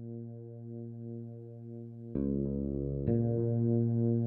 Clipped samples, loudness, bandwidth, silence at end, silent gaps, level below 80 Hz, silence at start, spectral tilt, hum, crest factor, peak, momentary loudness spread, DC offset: under 0.1%; -33 LUFS; 1.8 kHz; 0 s; none; -50 dBFS; 0 s; -14.5 dB/octave; none; 16 dB; -18 dBFS; 16 LU; under 0.1%